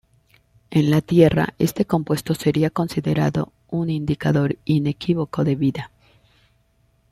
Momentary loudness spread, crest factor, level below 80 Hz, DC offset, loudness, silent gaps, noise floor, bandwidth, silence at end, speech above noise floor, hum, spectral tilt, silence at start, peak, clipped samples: 8 LU; 20 dB; -50 dBFS; under 0.1%; -21 LUFS; none; -62 dBFS; 15 kHz; 1.25 s; 42 dB; none; -7.5 dB/octave; 0.7 s; -2 dBFS; under 0.1%